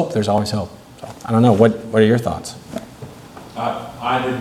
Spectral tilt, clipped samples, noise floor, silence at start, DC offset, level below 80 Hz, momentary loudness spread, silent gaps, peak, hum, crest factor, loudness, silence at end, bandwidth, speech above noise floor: -6.5 dB/octave; under 0.1%; -38 dBFS; 0 s; under 0.1%; -50 dBFS; 22 LU; none; 0 dBFS; none; 18 dB; -18 LUFS; 0 s; 14.5 kHz; 21 dB